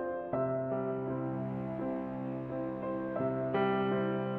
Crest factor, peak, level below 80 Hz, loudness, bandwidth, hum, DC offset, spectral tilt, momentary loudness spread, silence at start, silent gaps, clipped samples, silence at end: 14 dB; -20 dBFS; -64 dBFS; -35 LUFS; 4.7 kHz; none; under 0.1%; -10 dB/octave; 7 LU; 0 s; none; under 0.1%; 0 s